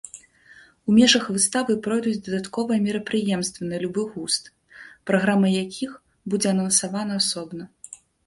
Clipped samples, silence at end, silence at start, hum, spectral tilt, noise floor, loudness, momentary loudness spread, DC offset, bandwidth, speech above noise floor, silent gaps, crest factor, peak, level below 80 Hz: under 0.1%; 0.3 s; 0.15 s; none; -3.5 dB/octave; -52 dBFS; -22 LUFS; 18 LU; under 0.1%; 11.5 kHz; 30 dB; none; 22 dB; -2 dBFS; -62 dBFS